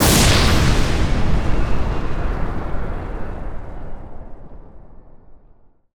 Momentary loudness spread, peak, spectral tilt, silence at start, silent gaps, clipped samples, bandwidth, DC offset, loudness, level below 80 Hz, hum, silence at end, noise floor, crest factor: 23 LU; -4 dBFS; -4 dB/octave; 0 s; none; under 0.1%; over 20 kHz; under 0.1%; -20 LUFS; -24 dBFS; none; 0.6 s; -49 dBFS; 14 dB